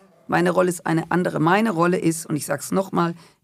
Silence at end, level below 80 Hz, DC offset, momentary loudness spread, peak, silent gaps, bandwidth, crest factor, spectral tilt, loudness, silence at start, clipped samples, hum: 0.25 s; -64 dBFS; under 0.1%; 7 LU; -6 dBFS; none; 16 kHz; 16 dB; -5.5 dB/octave; -21 LUFS; 0.3 s; under 0.1%; none